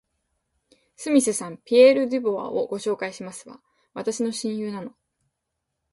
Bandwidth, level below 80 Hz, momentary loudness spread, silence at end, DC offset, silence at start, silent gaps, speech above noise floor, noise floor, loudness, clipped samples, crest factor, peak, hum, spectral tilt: 11.5 kHz; -72 dBFS; 21 LU; 1.05 s; under 0.1%; 1 s; none; 58 dB; -80 dBFS; -22 LUFS; under 0.1%; 20 dB; -4 dBFS; none; -4 dB/octave